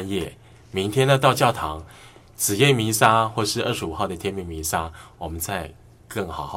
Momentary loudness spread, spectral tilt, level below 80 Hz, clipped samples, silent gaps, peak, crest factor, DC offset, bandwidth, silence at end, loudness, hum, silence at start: 16 LU; -4 dB/octave; -46 dBFS; under 0.1%; none; 0 dBFS; 24 dB; under 0.1%; 17 kHz; 0 s; -22 LUFS; none; 0 s